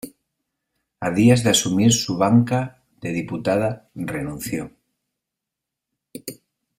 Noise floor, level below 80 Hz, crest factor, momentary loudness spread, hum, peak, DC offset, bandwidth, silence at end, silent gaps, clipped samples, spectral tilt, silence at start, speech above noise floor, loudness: -84 dBFS; -54 dBFS; 20 dB; 20 LU; none; -2 dBFS; under 0.1%; 16 kHz; 0.45 s; none; under 0.1%; -5 dB/octave; 0.05 s; 65 dB; -20 LUFS